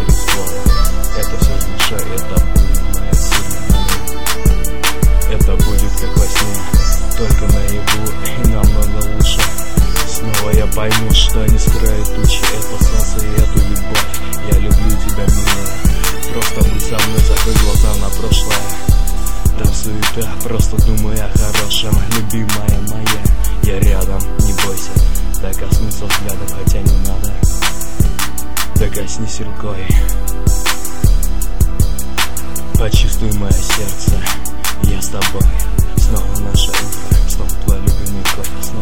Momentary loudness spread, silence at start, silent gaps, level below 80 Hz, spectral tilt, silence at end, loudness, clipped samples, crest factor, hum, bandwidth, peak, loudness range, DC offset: 5 LU; 0 s; none; -14 dBFS; -4 dB/octave; 0 s; -16 LUFS; 0.2%; 14 dB; none; 19.5 kHz; 0 dBFS; 3 LU; 30%